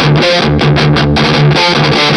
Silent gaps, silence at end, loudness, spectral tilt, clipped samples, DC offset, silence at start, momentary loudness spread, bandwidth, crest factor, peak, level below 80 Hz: none; 0 s; -8 LUFS; -5.5 dB/octave; under 0.1%; under 0.1%; 0 s; 1 LU; 10.5 kHz; 8 dB; 0 dBFS; -28 dBFS